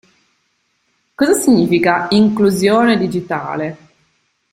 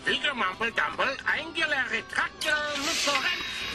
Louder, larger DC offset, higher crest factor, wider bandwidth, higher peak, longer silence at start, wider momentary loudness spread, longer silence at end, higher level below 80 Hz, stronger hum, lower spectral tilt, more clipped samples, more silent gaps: first, -14 LUFS vs -27 LUFS; neither; about the same, 14 dB vs 18 dB; first, 16 kHz vs 13 kHz; first, 0 dBFS vs -12 dBFS; first, 1.2 s vs 0 s; first, 10 LU vs 3 LU; first, 0.75 s vs 0 s; first, -52 dBFS vs -58 dBFS; neither; first, -5 dB/octave vs -1 dB/octave; neither; neither